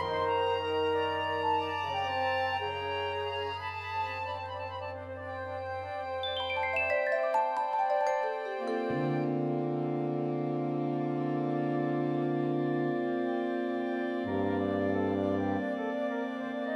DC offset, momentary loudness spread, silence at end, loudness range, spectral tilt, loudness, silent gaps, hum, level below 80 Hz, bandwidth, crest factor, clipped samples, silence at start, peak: under 0.1%; 7 LU; 0 s; 4 LU; -7 dB/octave; -32 LUFS; none; none; -68 dBFS; 11 kHz; 14 dB; under 0.1%; 0 s; -18 dBFS